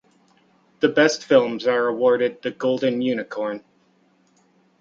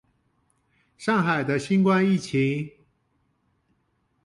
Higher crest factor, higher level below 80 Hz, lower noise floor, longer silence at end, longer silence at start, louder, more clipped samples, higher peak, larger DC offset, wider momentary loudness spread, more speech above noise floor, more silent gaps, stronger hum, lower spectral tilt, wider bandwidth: about the same, 20 dB vs 16 dB; second, -70 dBFS vs -64 dBFS; second, -61 dBFS vs -71 dBFS; second, 1.2 s vs 1.55 s; second, 0.8 s vs 1 s; about the same, -21 LUFS vs -23 LUFS; neither; first, -2 dBFS vs -10 dBFS; neither; about the same, 10 LU vs 11 LU; second, 41 dB vs 48 dB; neither; neither; second, -4.5 dB/octave vs -6.5 dB/octave; second, 7.6 kHz vs 11.5 kHz